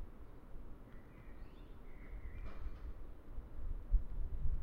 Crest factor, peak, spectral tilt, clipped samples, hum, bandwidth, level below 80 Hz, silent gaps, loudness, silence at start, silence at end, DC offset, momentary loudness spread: 20 dB; -20 dBFS; -8.5 dB/octave; under 0.1%; none; 3.8 kHz; -44 dBFS; none; -50 LUFS; 0 s; 0 s; under 0.1%; 16 LU